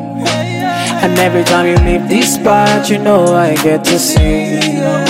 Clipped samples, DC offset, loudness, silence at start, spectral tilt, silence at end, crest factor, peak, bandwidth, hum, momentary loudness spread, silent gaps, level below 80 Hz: under 0.1%; under 0.1%; -11 LUFS; 0 s; -4.5 dB/octave; 0 s; 10 dB; 0 dBFS; 16.5 kHz; none; 6 LU; none; -22 dBFS